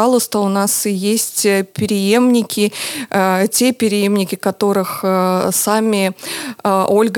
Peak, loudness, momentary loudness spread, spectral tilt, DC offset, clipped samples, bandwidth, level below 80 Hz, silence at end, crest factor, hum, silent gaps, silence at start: 0 dBFS; -15 LUFS; 5 LU; -4 dB/octave; under 0.1%; under 0.1%; 19.5 kHz; -64 dBFS; 0 s; 14 dB; none; none; 0 s